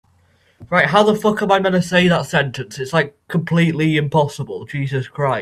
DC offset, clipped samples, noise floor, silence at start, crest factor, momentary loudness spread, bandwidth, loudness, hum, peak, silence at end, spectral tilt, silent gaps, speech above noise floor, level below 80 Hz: under 0.1%; under 0.1%; -57 dBFS; 0.6 s; 18 dB; 10 LU; 13.5 kHz; -17 LUFS; none; 0 dBFS; 0 s; -6 dB/octave; none; 40 dB; -52 dBFS